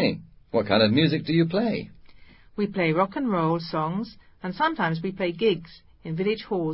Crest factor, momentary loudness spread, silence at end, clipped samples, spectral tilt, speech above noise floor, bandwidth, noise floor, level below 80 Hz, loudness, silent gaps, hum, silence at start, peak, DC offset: 18 dB; 15 LU; 0 s; under 0.1%; -11 dB/octave; 25 dB; 5.8 kHz; -49 dBFS; -56 dBFS; -25 LUFS; none; none; 0 s; -8 dBFS; under 0.1%